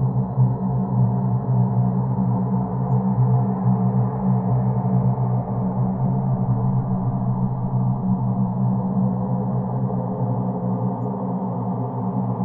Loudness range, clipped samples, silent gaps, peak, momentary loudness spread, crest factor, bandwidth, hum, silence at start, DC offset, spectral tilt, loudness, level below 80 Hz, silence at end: 3 LU; under 0.1%; none; -8 dBFS; 4 LU; 12 dB; 2 kHz; none; 0 s; under 0.1%; -15.5 dB/octave; -22 LUFS; -44 dBFS; 0 s